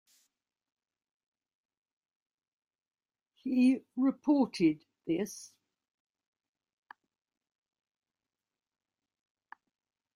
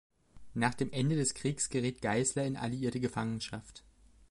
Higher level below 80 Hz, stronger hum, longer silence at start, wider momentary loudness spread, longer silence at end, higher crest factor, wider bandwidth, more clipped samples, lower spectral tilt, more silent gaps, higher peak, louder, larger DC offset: second, -80 dBFS vs -60 dBFS; neither; first, 3.45 s vs 0.35 s; first, 14 LU vs 10 LU; first, 4.7 s vs 0.05 s; about the same, 20 dB vs 20 dB; first, 13.5 kHz vs 11.5 kHz; neither; first, -6 dB/octave vs -4.5 dB/octave; neither; about the same, -16 dBFS vs -14 dBFS; first, -31 LUFS vs -34 LUFS; neither